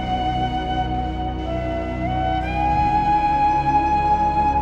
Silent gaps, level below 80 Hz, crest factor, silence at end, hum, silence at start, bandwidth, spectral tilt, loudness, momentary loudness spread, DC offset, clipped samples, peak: none; -30 dBFS; 12 dB; 0 s; none; 0 s; 8 kHz; -7 dB/octave; -21 LUFS; 7 LU; under 0.1%; under 0.1%; -8 dBFS